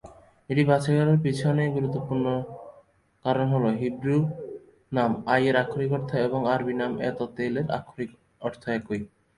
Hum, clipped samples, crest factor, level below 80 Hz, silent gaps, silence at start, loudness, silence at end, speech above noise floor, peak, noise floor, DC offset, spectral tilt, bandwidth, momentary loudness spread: none; under 0.1%; 18 dB; -58 dBFS; none; 0.05 s; -26 LUFS; 0.3 s; 33 dB; -8 dBFS; -58 dBFS; under 0.1%; -8 dB/octave; 11.5 kHz; 13 LU